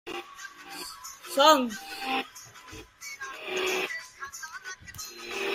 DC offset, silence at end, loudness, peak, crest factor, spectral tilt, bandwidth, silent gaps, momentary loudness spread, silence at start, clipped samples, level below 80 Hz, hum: under 0.1%; 0 s; -29 LUFS; -6 dBFS; 24 dB; -1.5 dB/octave; 16 kHz; none; 22 LU; 0.05 s; under 0.1%; -66 dBFS; none